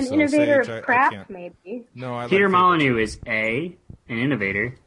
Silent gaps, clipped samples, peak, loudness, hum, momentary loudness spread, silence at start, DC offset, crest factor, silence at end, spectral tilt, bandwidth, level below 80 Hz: none; under 0.1%; -6 dBFS; -20 LUFS; none; 19 LU; 0 s; under 0.1%; 16 dB; 0.1 s; -6 dB/octave; 11 kHz; -52 dBFS